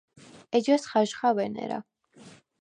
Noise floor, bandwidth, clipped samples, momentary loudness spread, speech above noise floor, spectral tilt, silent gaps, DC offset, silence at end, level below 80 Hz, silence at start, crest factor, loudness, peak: -53 dBFS; 10 kHz; under 0.1%; 11 LU; 27 dB; -5 dB/octave; none; under 0.1%; 0.3 s; -76 dBFS; 0.35 s; 18 dB; -27 LUFS; -10 dBFS